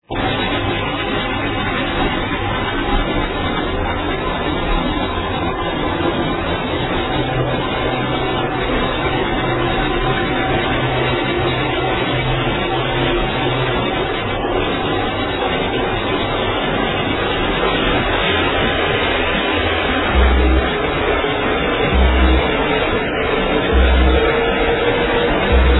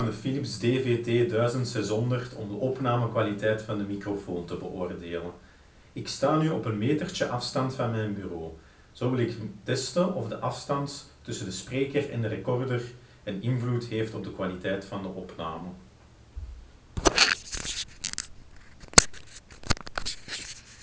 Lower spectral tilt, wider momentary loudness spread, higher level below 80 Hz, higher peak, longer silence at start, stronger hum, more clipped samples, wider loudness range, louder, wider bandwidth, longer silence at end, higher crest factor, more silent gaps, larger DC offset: first, -9 dB/octave vs -4 dB/octave; second, 5 LU vs 14 LU; first, -24 dBFS vs -48 dBFS; about the same, 0 dBFS vs 0 dBFS; about the same, 0.1 s vs 0 s; neither; neither; second, 4 LU vs 8 LU; first, -17 LUFS vs -28 LUFS; second, 4.1 kHz vs 8 kHz; about the same, 0 s vs 0 s; second, 16 dB vs 30 dB; neither; neither